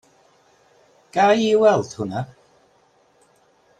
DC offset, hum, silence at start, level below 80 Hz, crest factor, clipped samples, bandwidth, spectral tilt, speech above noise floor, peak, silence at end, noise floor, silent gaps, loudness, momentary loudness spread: under 0.1%; none; 1.15 s; -66 dBFS; 20 dB; under 0.1%; 9.4 kHz; -5.5 dB/octave; 41 dB; -4 dBFS; 1.55 s; -59 dBFS; none; -19 LUFS; 14 LU